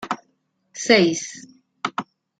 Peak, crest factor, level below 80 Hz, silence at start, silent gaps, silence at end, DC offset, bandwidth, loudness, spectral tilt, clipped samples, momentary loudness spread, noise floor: -2 dBFS; 22 dB; -68 dBFS; 0 s; none; 0.35 s; under 0.1%; 9.4 kHz; -21 LUFS; -3.5 dB/octave; under 0.1%; 21 LU; -69 dBFS